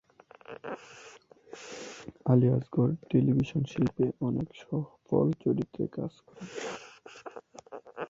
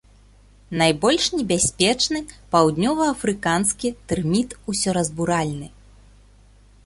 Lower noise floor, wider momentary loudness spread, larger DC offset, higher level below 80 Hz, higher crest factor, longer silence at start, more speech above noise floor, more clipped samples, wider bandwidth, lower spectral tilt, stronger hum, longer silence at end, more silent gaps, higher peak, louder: about the same, -54 dBFS vs -51 dBFS; first, 22 LU vs 9 LU; neither; second, -60 dBFS vs -46 dBFS; about the same, 22 dB vs 20 dB; second, 0.5 s vs 0.7 s; second, 26 dB vs 30 dB; neither; second, 7.8 kHz vs 12 kHz; first, -8 dB/octave vs -3.5 dB/octave; second, none vs 50 Hz at -45 dBFS; second, 0 s vs 1.2 s; neither; second, -10 dBFS vs -2 dBFS; second, -30 LUFS vs -21 LUFS